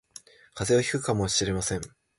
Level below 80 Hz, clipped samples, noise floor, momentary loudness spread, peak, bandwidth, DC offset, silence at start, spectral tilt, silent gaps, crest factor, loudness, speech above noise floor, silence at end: -48 dBFS; under 0.1%; -51 dBFS; 10 LU; -10 dBFS; 11.5 kHz; under 0.1%; 0.55 s; -4 dB/octave; none; 18 dB; -26 LUFS; 25 dB; 0.3 s